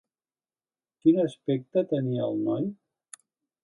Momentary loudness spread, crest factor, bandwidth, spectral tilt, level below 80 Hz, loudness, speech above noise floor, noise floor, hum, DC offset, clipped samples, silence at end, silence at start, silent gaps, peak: 8 LU; 20 dB; 11.5 kHz; -8 dB/octave; -76 dBFS; -27 LUFS; over 64 dB; under -90 dBFS; none; under 0.1%; under 0.1%; 0.9 s; 1.05 s; none; -10 dBFS